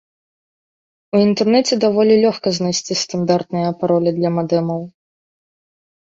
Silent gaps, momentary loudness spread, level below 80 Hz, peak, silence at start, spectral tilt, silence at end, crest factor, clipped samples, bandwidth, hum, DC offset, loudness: none; 7 LU; -62 dBFS; -2 dBFS; 1.15 s; -5.5 dB/octave; 1.2 s; 16 dB; under 0.1%; 7.8 kHz; none; under 0.1%; -17 LUFS